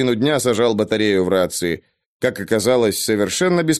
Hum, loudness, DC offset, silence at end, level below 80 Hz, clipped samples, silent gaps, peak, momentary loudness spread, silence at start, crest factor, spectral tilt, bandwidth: none; -18 LUFS; under 0.1%; 0 s; -54 dBFS; under 0.1%; 2.06-2.20 s; -2 dBFS; 6 LU; 0 s; 16 dB; -4.5 dB/octave; 13 kHz